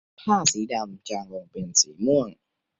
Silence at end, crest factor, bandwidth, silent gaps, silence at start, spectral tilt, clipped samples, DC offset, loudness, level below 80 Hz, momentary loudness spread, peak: 0.45 s; 22 dB; 8.4 kHz; none; 0.2 s; -2.5 dB/octave; under 0.1%; under 0.1%; -24 LUFS; -64 dBFS; 14 LU; -4 dBFS